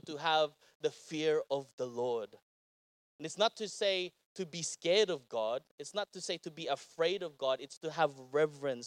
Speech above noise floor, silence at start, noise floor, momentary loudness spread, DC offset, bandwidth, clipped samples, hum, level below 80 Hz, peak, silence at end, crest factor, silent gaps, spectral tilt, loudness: over 55 dB; 0.05 s; under -90 dBFS; 10 LU; under 0.1%; 12 kHz; under 0.1%; none; under -90 dBFS; -16 dBFS; 0 s; 20 dB; 0.75-0.80 s, 1.73-1.78 s, 2.42-3.19 s, 4.25-4.35 s, 5.71-5.78 s, 7.77-7.81 s; -3 dB/octave; -35 LUFS